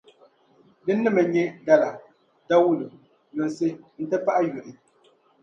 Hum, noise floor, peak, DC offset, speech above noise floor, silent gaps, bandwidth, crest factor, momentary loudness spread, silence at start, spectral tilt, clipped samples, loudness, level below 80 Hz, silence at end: none; -61 dBFS; -6 dBFS; under 0.1%; 38 dB; none; 7.8 kHz; 20 dB; 16 LU; 0.85 s; -7 dB/octave; under 0.1%; -23 LUFS; -74 dBFS; 0.7 s